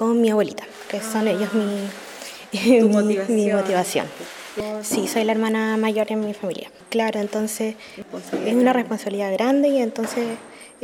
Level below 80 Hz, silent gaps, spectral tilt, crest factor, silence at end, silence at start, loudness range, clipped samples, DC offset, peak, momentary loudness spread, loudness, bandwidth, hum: -66 dBFS; none; -5 dB/octave; 18 dB; 0.15 s; 0 s; 3 LU; under 0.1%; under 0.1%; -4 dBFS; 15 LU; -21 LUFS; 17 kHz; none